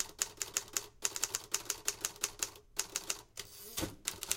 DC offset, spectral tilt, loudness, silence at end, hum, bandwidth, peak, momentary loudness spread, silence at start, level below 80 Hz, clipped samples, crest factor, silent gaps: under 0.1%; 0 dB/octave; -38 LUFS; 0 s; none; 17 kHz; -8 dBFS; 5 LU; 0 s; -62 dBFS; under 0.1%; 32 dB; none